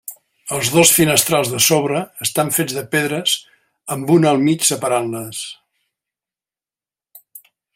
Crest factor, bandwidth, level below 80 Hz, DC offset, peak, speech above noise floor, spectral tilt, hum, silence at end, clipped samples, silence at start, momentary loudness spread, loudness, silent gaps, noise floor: 18 dB; 16.5 kHz; -58 dBFS; under 0.1%; 0 dBFS; over 73 dB; -3 dB/octave; none; 0.4 s; under 0.1%; 0.1 s; 15 LU; -16 LUFS; none; under -90 dBFS